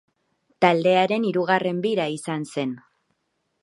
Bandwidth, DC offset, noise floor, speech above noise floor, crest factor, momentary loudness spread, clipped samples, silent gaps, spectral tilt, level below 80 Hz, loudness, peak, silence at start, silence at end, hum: 11.5 kHz; under 0.1%; -74 dBFS; 52 dB; 22 dB; 10 LU; under 0.1%; none; -5.5 dB/octave; -74 dBFS; -22 LUFS; -2 dBFS; 0.6 s; 0.85 s; none